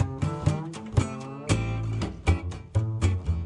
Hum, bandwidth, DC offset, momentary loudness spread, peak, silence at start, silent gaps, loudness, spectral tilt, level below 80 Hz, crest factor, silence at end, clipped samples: none; 10.5 kHz; under 0.1%; 4 LU; -8 dBFS; 0 s; none; -29 LUFS; -6.5 dB/octave; -38 dBFS; 20 dB; 0 s; under 0.1%